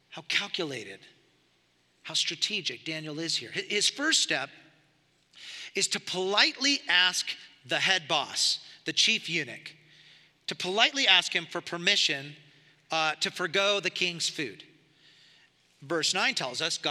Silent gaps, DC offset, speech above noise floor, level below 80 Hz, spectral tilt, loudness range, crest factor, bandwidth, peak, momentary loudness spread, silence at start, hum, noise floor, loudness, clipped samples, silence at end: none; under 0.1%; 40 dB; -86 dBFS; -1 dB/octave; 5 LU; 26 dB; 15.5 kHz; -4 dBFS; 15 LU; 0.1 s; 60 Hz at -70 dBFS; -68 dBFS; -26 LUFS; under 0.1%; 0 s